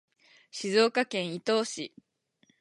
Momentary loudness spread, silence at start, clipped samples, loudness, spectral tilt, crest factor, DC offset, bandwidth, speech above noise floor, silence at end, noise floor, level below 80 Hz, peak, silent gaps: 16 LU; 0.55 s; under 0.1%; -28 LUFS; -3.5 dB/octave; 20 dB; under 0.1%; 11.5 kHz; 41 dB; 0.75 s; -69 dBFS; -84 dBFS; -10 dBFS; none